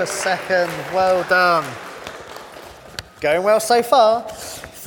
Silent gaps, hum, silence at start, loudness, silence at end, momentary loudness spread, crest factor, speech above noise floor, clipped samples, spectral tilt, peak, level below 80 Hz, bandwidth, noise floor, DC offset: none; none; 0 s; -17 LUFS; 0 s; 20 LU; 16 dB; 22 dB; under 0.1%; -3 dB/octave; -2 dBFS; -54 dBFS; 19 kHz; -39 dBFS; under 0.1%